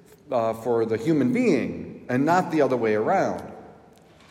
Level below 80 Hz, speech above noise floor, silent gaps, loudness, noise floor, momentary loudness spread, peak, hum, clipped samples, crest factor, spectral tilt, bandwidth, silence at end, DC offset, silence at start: -66 dBFS; 30 dB; none; -23 LUFS; -52 dBFS; 10 LU; -8 dBFS; none; under 0.1%; 16 dB; -7 dB/octave; 15.5 kHz; 0.6 s; under 0.1%; 0.3 s